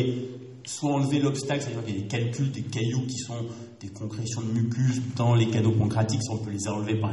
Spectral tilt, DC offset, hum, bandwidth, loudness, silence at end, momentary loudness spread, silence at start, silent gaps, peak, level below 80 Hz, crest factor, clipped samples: -6 dB/octave; under 0.1%; none; 11.5 kHz; -27 LUFS; 0 s; 13 LU; 0 s; none; -12 dBFS; -58 dBFS; 16 dB; under 0.1%